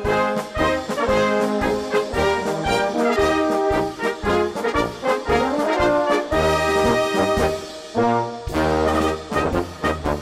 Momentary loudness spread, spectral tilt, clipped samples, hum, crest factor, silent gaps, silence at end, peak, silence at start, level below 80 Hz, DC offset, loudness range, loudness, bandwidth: 5 LU; -5 dB/octave; under 0.1%; none; 12 dB; none; 0 s; -8 dBFS; 0 s; -36 dBFS; under 0.1%; 1 LU; -20 LUFS; 16 kHz